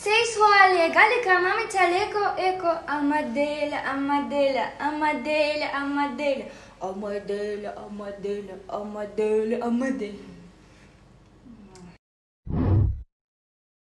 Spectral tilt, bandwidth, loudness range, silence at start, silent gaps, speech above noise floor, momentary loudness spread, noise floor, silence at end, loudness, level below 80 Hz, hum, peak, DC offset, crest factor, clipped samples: -5 dB/octave; 12 kHz; 10 LU; 0 s; 11.99-12.43 s; 28 dB; 17 LU; -53 dBFS; 0.9 s; -24 LUFS; -44 dBFS; 50 Hz at -60 dBFS; -2 dBFS; under 0.1%; 22 dB; under 0.1%